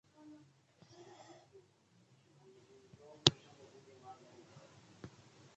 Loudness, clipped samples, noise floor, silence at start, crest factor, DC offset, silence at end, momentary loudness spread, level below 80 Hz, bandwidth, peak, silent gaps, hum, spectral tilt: -32 LUFS; under 0.1%; -70 dBFS; 3.25 s; 42 dB; under 0.1%; 1.45 s; 30 LU; -72 dBFS; 8.4 kHz; -4 dBFS; none; none; -3.5 dB/octave